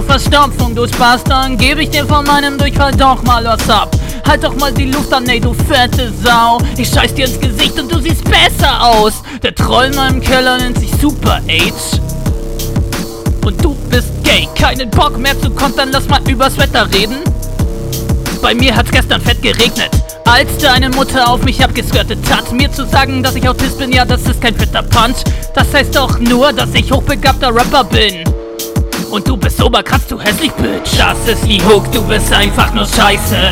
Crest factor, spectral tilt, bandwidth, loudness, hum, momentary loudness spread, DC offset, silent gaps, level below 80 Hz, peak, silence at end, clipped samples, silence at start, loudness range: 10 dB; -4.5 dB/octave; 18.5 kHz; -11 LUFS; none; 7 LU; under 0.1%; none; -18 dBFS; 0 dBFS; 0 s; 1%; 0 s; 3 LU